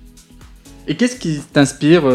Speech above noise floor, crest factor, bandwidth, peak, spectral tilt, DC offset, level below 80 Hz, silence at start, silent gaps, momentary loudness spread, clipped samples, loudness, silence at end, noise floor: 27 dB; 16 dB; 13.5 kHz; 0 dBFS; -5.5 dB/octave; under 0.1%; -44 dBFS; 0.85 s; none; 13 LU; under 0.1%; -16 LUFS; 0 s; -42 dBFS